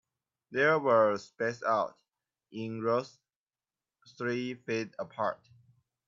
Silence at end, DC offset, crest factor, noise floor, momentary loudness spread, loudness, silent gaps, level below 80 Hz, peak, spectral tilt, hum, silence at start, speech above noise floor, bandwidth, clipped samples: 0.75 s; under 0.1%; 20 dB; under -90 dBFS; 14 LU; -31 LUFS; 3.36-3.46 s; -80 dBFS; -12 dBFS; -6 dB/octave; none; 0.5 s; over 59 dB; 7.6 kHz; under 0.1%